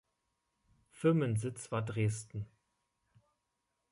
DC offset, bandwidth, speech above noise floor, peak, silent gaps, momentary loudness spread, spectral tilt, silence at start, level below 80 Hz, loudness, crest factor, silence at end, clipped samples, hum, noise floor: under 0.1%; 11.5 kHz; 51 dB; -18 dBFS; none; 15 LU; -7 dB/octave; 0.95 s; -66 dBFS; -35 LUFS; 20 dB; 1.45 s; under 0.1%; none; -84 dBFS